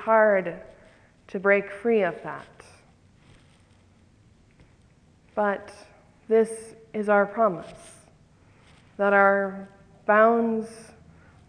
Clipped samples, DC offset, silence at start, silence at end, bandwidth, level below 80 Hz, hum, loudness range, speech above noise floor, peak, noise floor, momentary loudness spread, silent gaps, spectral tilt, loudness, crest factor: under 0.1%; under 0.1%; 0 s; 0.65 s; 10.5 kHz; -64 dBFS; none; 11 LU; 35 dB; -6 dBFS; -58 dBFS; 20 LU; none; -6.5 dB/octave; -23 LUFS; 20 dB